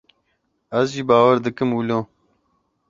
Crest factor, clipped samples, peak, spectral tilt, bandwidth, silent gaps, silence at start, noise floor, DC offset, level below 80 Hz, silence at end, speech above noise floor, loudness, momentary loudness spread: 20 dB; under 0.1%; -2 dBFS; -6.5 dB/octave; 7.6 kHz; none; 0.7 s; -70 dBFS; under 0.1%; -60 dBFS; 0.85 s; 52 dB; -19 LUFS; 11 LU